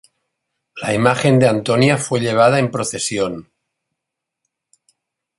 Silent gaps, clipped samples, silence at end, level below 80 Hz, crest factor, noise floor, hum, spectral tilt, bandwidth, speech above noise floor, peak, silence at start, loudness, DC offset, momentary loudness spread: none; under 0.1%; 1.95 s; -54 dBFS; 18 dB; -81 dBFS; none; -5 dB/octave; 11.5 kHz; 66 dB; -2 dBFS; 0.75 s; -16 LUFS; under 0.1%; 9 LU